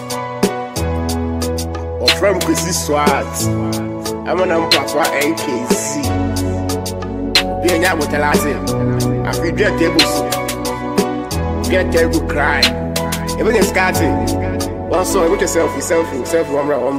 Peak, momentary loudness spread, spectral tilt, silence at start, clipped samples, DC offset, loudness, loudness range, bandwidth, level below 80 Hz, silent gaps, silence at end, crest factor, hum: 0 dBFS; 7 LU; -4 dB/octave; 0 s; under 0.1%; under 0.1%; -16 LUFS; 1 LU; 16 kHz; -32 dBFS; none; 0 s; 16 dB; none